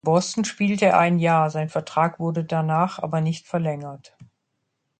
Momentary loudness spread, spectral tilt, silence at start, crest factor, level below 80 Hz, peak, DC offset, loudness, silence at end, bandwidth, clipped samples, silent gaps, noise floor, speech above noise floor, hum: 9 LU; -6 dB/octave; 0.05 s; 18 dB; -66 dBFS; -4 dBFS; under 0.1%; -22 LUFS; 0.75 s; 9.2 kHz; under 0.1%; none; -76 dBFS; 54 dB; none